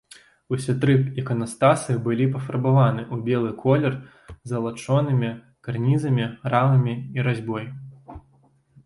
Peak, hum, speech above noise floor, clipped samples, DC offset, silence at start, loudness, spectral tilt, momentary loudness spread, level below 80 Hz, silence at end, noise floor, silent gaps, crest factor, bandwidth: -4 dBFS; none; 38 dB; under 0.1%; under 0.1%; 0.5 s; -23 LUFS; -7.5 dB/octave; 12 LU; -56 dBFS; 0.65 s; -59 dBFS; none; 18 dB; 11.5 kHz